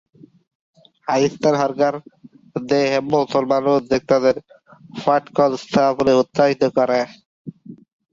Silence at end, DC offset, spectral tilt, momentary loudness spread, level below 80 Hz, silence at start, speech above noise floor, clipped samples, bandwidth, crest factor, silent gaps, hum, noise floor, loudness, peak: 0.35 s; under 0.1%; -6 dB/octave; 15 LU; -58 dBFS; 1.1 s; 20 dB; under 0.1%; 7.6 kHz; 16 dB; 7.25-7.45 s; none; -37 dBFS; -18 LUFS; -2 dBFS